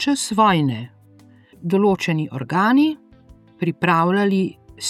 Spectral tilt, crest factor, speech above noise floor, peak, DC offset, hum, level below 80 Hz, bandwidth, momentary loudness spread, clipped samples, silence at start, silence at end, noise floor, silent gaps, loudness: -5.5 dB/octave; 16 dB; 31 dB; -4 dBFS; under 0.1%; none; -56 dBFS; 14.5 kHz; 12 LU; under 0.1%; 0 s; 0 s; -49 dBFS; none; -19 LUFS